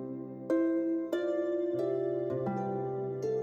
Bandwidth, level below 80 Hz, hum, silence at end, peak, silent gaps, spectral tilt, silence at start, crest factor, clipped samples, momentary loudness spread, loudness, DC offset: 7.6 kHz; -74 dBFS; none; 0 s; -20 dBFS; none; -8.5 dB/octave; 0 s; 12 dB; under 0.1%; 5 LU; -33 LUFS; under 0.1%